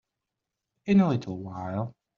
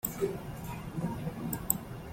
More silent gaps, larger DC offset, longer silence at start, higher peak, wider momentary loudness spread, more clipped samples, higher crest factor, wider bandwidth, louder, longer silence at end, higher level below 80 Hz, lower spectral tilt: neither; neither; first, 0.85 s vs 0.05 s; second, -12 dBFS vs -8 dBFS; first, 14 LU vs 9 LU; neither; second, 18 dB vs 30 dB; second, 7 kHz vs 16.5 kHz; first, -27 LUFS vs -36 LUFS; first, 0.25 s vs 0 s; second, -66 dBFS vs -52 dBFS; first, -8 dB/octave vs -5.5 dB/octave